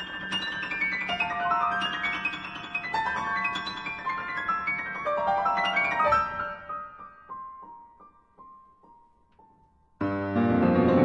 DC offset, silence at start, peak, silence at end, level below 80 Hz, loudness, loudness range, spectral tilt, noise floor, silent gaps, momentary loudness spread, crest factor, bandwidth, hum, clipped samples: under 0.1%; 0 s; -8 dBFS; 0 s; -58 dBFS; -27 LUFS; 13 LU; -6 dB/octave; -62 dBFS; none; 16 LU; 22 dB; 9.4 kHz; none; under 0.1%